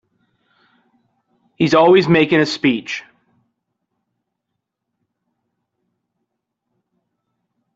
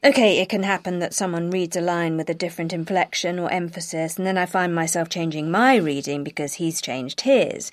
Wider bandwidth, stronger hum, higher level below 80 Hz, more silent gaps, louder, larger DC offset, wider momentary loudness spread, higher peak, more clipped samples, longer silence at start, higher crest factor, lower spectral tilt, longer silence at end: second, 8 kHz vs 15.5 kHz; neither; first, -60 dBFS vs -68 dBFS; neither; first, -14 LUFS vs -22 LUFS; neither; first, 14 LU vs 9 LU; about the same, -2 dBFS vs -2 dBFS; neither; first, 1.6 s vs 0.05 s; about the same, 18 dB vs 20 dB; first, -6 dB/octave vs -4 dB/octave; first, 4.75 s vs 0.05 s